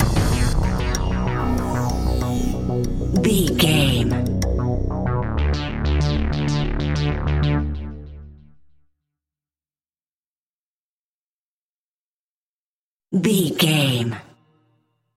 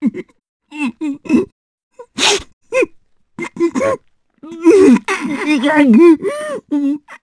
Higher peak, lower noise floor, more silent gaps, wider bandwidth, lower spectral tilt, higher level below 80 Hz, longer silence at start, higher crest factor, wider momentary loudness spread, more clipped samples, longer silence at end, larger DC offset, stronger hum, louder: second, -4 dBFS vs 0 dBFS; first, under -90 dBFS vs -48 dBFS; first, 10.07-13.00 s vs 0.49-0.60 s, 1.52-1.91 s, 2.53-2.61 s; first, 16.5 kHz vs 11 kHz; first, -5.5 dB/octave vs -4 dB/octave; first, -28 dBFS vs -54 dBFS; about the same, 0 s vs 0 s; about the same, 18 dB vs 14 dB; second, 7 LU vs 19 LU; neither; first, 0.9 s vs 0.05 s; neither; neither; second, -21 LUFS vs -14 LUFS